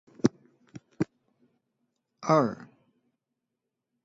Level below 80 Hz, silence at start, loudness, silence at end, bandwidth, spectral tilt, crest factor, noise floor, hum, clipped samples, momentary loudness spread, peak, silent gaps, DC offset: -68 dBFS; 0.25 s; -29 LUFS; 1.4 s; 7.8 kHz; -7 dB/octave; 26 dB; -85 dBFS; none; under 0.1%; 12 LU; -6 dBFS; none; under 0.1%